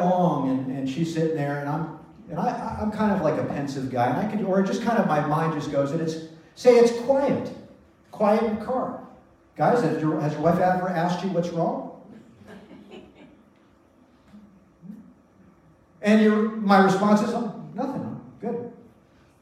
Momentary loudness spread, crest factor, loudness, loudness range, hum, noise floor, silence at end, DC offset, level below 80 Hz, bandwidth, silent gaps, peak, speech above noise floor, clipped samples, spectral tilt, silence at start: 16 LU; 20 dB; -24 LUFS; 5 LU; none; -57 dBFS; 0.65 s; under 0.1%; -58 dBFS; 13.5 kHz; none; -4 dBFS; 35 dB; under 0.1%; -7 dB/octave; 0 s